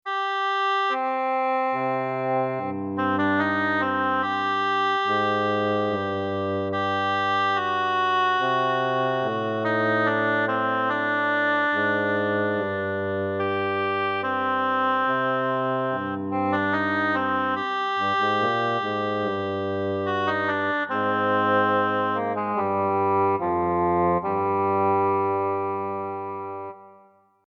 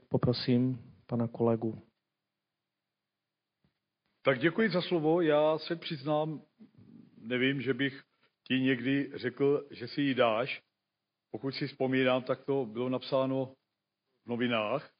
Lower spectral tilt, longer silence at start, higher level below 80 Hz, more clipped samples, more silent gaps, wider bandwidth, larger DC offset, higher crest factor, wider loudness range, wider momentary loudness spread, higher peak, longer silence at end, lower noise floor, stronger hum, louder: first, -6.5 dB/octave vs -4.5 dB/octave; about the same, 0.05 s vs 0.1 s; first, -64 dBFS vs -72 dBFS; neither; neither; first, 7.2 kHz vs 5 kHz; neither; second, 12 dB vs 18 dB; second, 2 LU vs 5 LU; second, 5 LU vs 11 LU; about the same, -12 dBFS vs -14 dBFS; first, 0.55 s vs 0.1 s; second, -56 dBFS vs -89 dBFS; neither; first, -24 LUFS vs -31 LUFS